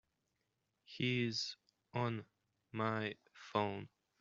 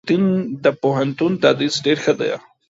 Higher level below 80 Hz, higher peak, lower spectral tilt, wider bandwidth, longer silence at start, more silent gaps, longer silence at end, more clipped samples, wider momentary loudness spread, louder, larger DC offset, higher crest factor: second, -80 dBFS vs -62 dBFS; second, -20 dBFS vs 0 dBFS; second, -4 dB/octave vs -5.5 dB/octave; about the same, 7.6 kHz vs 8 kHz; first, 0.9 s vs 0.05 s; neither; about the same, 0.35 s vs 0.3 s; neither; first, 17 LU vs 4 LU; second, -40 LUFS vs -18 LUFS; neither; about the same, 22 dB vs 18 dB